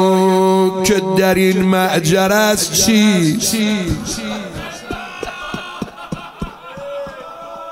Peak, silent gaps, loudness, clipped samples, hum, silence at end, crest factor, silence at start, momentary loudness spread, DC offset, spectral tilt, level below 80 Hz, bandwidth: -2 dBFS; none; -14 LUFS; under 0.1%; none; 0 s; 14 dB; 0 s; 17 LU; under 0.1%; -4 dB/octave; -40 dBFS; 16.5 kHz